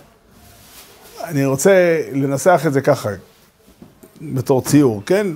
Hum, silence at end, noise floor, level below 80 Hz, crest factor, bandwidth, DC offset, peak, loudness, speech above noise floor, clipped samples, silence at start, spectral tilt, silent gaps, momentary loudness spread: none; 0 s; -50 dBFS; -56 dBFS; 18 dB; 16 kHz; under 0.1%; 0 dBFS; -16 LUFS; 35 dB; under 0.1%; 0.75 s; -6 dB/octave; none; 14 LU